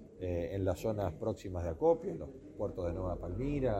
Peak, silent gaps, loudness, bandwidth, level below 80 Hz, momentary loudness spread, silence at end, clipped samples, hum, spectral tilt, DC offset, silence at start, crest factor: -18 dBFS; none; -36 LUFS; 15.5 kHz; -50 dBFS; 10 LU; 0 s; under 0.1%; none; -8 dB/octave; under 0.1%; 0 s; 18 dB